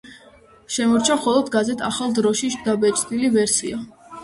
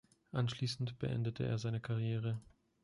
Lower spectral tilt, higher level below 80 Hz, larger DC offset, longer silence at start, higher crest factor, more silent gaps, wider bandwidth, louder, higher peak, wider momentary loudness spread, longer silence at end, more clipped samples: second, -3 dB/octave vs -6.5 dB/octave; first, -56 dBFS vs -64 dBFS; neither; second, 0.05 s vs 0.35 s; about the same, 16 dB vs 16 dB; neither; about the same, 12 kHz vs 11.5 kHz; first, -20 LUFS vs -39 LUFS; first, -4 dBFS vs -24 dBFS; first, 8 LU vs 4 LU; second, 0 s vs 0.4 s; neither